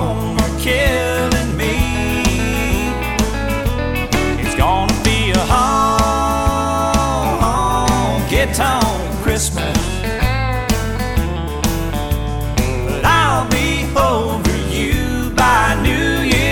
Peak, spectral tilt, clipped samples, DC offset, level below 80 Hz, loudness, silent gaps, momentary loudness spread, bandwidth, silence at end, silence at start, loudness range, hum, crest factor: -4 dBFS; -4.5 dB/octave; under 0.1%; under 0.1%; -22 dBFS; -16 LUFS; none; 6 LU; 19.5 kHz; 0 s; 0 s; 3 LU; none; 12 dB